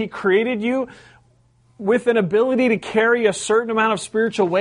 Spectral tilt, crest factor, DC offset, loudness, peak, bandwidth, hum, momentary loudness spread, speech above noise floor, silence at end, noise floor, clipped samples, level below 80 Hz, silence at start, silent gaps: -5 dB/octave; 14 dB; under 0.1%; -19 LUFS; -4 dBFS; 10.5 kHz; none; 5 LU; 38 dB; 0 s; -57 dBFS; under 0.1%; -60 dBFS; 0 s; none